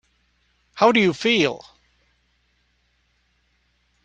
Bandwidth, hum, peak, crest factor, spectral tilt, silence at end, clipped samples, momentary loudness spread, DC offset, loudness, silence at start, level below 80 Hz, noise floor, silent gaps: 9.4 kHz; 60 Hz at -60 dBFS; -4 dBFS; 22 dB; -4.5 dB/octave; 2.45 s; under 0.1%; 20 LU; under 0.1%; -19 LUFS; 0.75 s; -64 dBFS; -66 dBFS; none